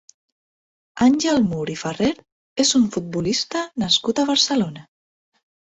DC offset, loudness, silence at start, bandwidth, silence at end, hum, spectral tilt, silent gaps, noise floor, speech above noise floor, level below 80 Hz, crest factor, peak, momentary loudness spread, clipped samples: under 0.1%; -20 LUFS; 0.95 s; 8.4 kHz; 0.95 s; none; -3.5 dB/octave; 2.32-2.56 s; under -90 dBFS; over 70 dB; -54 dBFS; 18 dB; -4 dBFS; 10 LU; under 0.1%